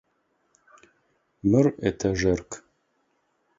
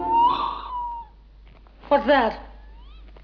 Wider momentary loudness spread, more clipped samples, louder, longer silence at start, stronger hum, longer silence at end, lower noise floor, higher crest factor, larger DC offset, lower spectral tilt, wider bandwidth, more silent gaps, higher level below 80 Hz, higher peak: about the same, 16 LU vs 16 LU; neither; about the same, -24 LUFS vs -22 LUFS; first, 1.45 s vs 0 s; neither; first, 1 s vs 0 s; first, -71 dBFS vs -48 dBFS; about the same, 20 dB vs 18 dB; neither; about the same, -6.5 dB/octave vs -6.5 dB/octave; first, 7.8 kHz vs 5.4 kHz; neither; about the same, -48 dBFS vs -44 dBFS; about the same, -8 dBFS vs -8 dBFS